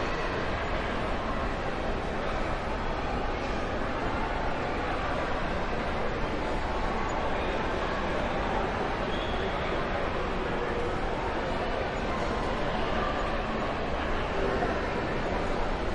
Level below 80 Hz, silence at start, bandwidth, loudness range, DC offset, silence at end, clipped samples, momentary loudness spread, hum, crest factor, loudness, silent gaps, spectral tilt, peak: -36 dBFS; 0 s; 10.5 kHz; 1 LU; under 0.1%; 0 s; under 0.1%; 2 LU; none; 14 dB; -31 LUFS; none; -6 dB/octave; -16 dBFS